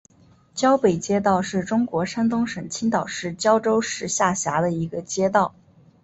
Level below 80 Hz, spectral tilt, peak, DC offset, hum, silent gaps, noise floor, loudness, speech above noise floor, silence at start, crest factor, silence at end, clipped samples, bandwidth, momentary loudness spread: -56 dBFS; -4.5 dB/octave; -4 dBFS; under 0.1%; none; none; -55 dBFS; -22 LUFS; 33 dB; 0.55 s; 18 dB; 0.55 s; under 0.1%; 8.2 kHz; 7 LU